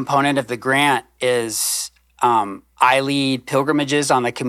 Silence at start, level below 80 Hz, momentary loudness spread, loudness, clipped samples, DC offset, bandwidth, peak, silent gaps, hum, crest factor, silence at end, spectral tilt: 0 s; -60 dBFS; 5 LU; -18 LUFS; under 0.1%; under 0.1%; 15 kHz; -2 dBFS; none; none; 16 dB; 0 s; -3.5 dB/octave